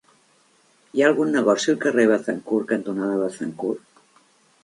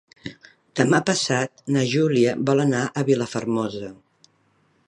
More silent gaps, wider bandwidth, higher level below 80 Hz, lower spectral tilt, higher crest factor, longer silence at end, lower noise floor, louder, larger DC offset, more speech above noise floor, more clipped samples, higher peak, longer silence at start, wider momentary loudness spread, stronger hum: neither; about the same, 11.5 kHz vs 11.5 kHz; second, -72 dBFS vs -64 dBFS; about the same, -5 dB/octave vs -5 dB/octave; about the same, 20 dB vs 20 dB; about the same, 0.85 s vs 0.95 s; about the same, -60 dBFS vs -63 dBFS; about the same, -22 LUFS vs -22 LUFS; neither; about the same, 39 dB vs 42 dB; neither; about the same, -4 dBFS vs -4 dBFS; first, 0.95 s vs 0.25 s; second, 10 LU vs 17 LU; neither